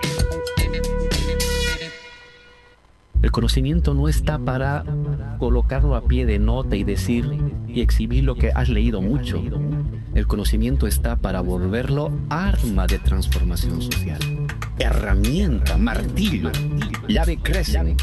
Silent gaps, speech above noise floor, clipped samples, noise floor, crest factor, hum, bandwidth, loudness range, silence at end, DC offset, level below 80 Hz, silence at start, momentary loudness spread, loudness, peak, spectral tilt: none; 33 dB; under 0.1%; -52 dBFS; 14 dB; none; 12.5 kHz; 2 LU; 0 s; under 0.1%; -22 dBFS; 0 s; 5 LU; -22 LUFS; -6 dBFS; -6 dB/octave